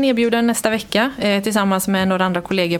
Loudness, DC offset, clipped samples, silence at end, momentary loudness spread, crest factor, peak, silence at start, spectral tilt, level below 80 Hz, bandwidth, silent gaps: -18 LUFS; under 0.1%; under 0.1%; 0 s; 3 LU; 16 dB; 0 dBFS; 0 s; -4.5 dB/octave; -52 dBFS; 18 kHz; none